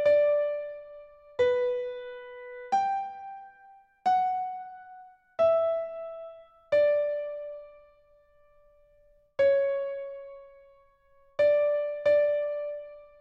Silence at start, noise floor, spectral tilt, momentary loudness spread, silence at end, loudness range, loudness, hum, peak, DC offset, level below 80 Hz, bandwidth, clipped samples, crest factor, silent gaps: 0 s; -62 dBFS; -4.5 dB/octave; 21 LU; 0.15 s; 4 LU; -28 LUFS; none; -14 dBFS; under 0.1%; -68 dBFS; 7 kHz; under 0.1%; 16 dB; none